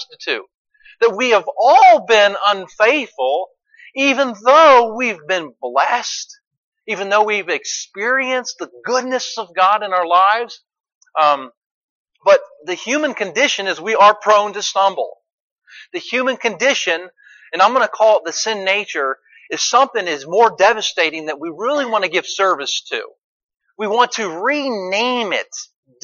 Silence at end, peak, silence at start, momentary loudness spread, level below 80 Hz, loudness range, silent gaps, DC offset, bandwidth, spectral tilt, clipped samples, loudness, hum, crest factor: 0.4 s; -2 dBFS; 0 s; 14 LU; -72 dBFS; 6 LU; 0.55-0.65 s, 6.47-6.51 s, 6.57-6.72 s, 10.95-11.01 s, 11.57-12.05 s, 15.33-15.57 s, 23.18-23.49 s; under 0.1%; 7.4 kHz; -1.5 dB/octave; under 0.1%; -16 LUFS; none; 16 dB